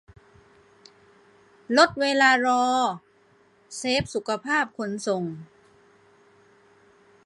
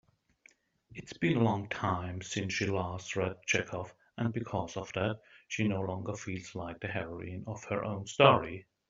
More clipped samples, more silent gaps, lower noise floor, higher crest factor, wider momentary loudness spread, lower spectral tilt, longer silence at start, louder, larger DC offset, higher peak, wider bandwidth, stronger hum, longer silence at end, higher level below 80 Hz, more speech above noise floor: neither; neither; second, -60 dBFS vs -65 dBFS; about the same, 24 dB vs 26 dB; about the same, 15 LU vs 14 LU; second, -3.5 dB/octave vs -5 dB/octave; first, 1.7 s vs 0.9 s; first, -23 LUFS vs -33 LUFS; neither; about the same, -4 dBFS vs -6 dBFS; first, 11.5 kHz vs 7.8 kHz; neither; first, 1.8 s vs 0.25 s; about the same, -60 dBFS vs -64 dBFS; first, 37 dB vs 33 dB